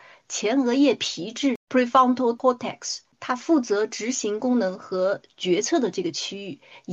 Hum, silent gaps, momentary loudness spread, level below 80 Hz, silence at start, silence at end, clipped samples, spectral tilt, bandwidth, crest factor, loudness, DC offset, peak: none; 1.56-1.67 s; 12 LU; -74 dBFS; 0.3 s; 0 s; under 0.1%; -3.5 dB/octave; 8.4 kHz; 18 dB; -24 LUFS; under 0.1%; -6 dBFS